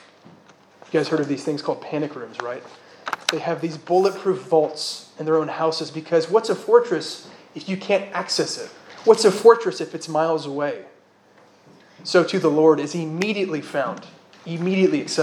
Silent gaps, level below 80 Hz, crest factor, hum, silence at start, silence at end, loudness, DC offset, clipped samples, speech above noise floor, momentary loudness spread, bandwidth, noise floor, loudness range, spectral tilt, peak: none; -80 dBFS; 22 dB; none; 0.9 s; 0 s; -21 LUFS; under 0.1%; under 0.1%; 33 dB; 15 LU; 12.5 kHz; -54 dBFS; 5 LU; -5 dB/octave; 0 dBFS